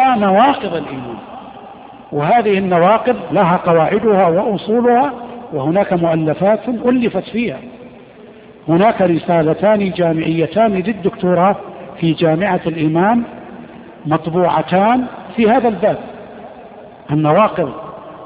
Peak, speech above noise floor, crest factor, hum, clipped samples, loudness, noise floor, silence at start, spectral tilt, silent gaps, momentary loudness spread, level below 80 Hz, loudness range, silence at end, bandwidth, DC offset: 0 dBFS; 25 dB; 14 dB; none; under 0.1%; -15 LUFS; -39 dBFS; 0 s; -6 dB/octave; none; 18 LU; -50 dBFS; 3 LU; 0 s; 5 kHz; under 0.1%